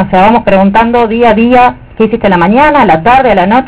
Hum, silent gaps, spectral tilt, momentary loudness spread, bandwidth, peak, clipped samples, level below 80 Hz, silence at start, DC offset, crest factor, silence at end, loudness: none; none; -10 dB/octave; 4 LU; 4 kHz; 0 dBFS; 4%; -30 dBFS; 0 s; 2%; 6 dB; 0 s; -6 LUFS